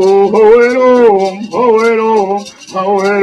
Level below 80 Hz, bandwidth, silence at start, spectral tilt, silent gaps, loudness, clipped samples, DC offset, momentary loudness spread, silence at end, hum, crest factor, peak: -48 dBFS; 10.5 kHz; 0 s; -5.5 dB/octave; none; -9 LUFS; 0.3%; under 0.1%; 10 LU; 0 s; none; 8 dB; 0 dBFS